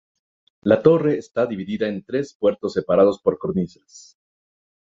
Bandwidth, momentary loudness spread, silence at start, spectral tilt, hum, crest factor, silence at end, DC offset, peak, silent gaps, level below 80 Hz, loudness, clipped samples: 7.6 kHz; 10 LU; 0.65 s; -7.5 dB/octave; none; 20 dB; 0.85 s; under 0.1%; -2 dBFS; 2.35-2.40 s; -56 dBFS; -21 LUFS; under 0.1%